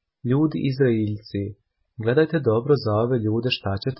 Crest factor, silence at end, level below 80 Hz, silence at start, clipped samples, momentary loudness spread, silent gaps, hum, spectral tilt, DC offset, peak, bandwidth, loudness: 16 dB; 0.05 s; -50 dBFS; 0.25 s; under 0.1%; 9 LU; none; none; -11.5 dB/octave; under 0.1%; -6 dBFS; 5.8 kHz; -22 LUFS